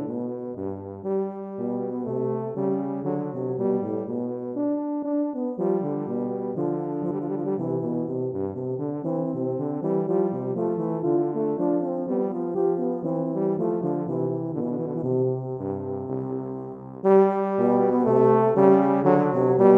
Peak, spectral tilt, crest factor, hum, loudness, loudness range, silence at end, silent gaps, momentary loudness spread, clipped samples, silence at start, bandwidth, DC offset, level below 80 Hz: -4 dBFS; -11.5 dB/octave; 20 dB; none; -25 LUFS; 7 LU; 0 s; none; 11 LU; under 0.1%; 0 s; 3.3 kHz; under 0.1%; -72 dBFS